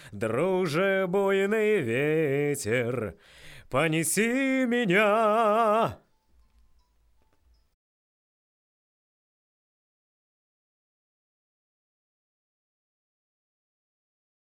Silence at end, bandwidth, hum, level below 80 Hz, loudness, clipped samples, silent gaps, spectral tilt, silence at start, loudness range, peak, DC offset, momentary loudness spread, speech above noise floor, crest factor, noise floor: 8.55 s; 16 kHz; none; -62 dBFS; -25 LUFS; under 0.1%; none; -5 dB/octave; 0 s; 4 LU; -12 dBFS; under 0.1%; 7 LU; 40 dB; 18 dB; -65 dBFS